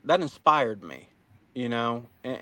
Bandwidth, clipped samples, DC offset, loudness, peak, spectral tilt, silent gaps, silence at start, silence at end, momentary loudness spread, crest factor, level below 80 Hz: 17 kHz; under 0.1%; under 0.1%; -26 LUFS; -4 dBFS; -5.5 dB/octave; none; 0.05 s; 0 s; 20 LU; 24 dB; -72 dBFS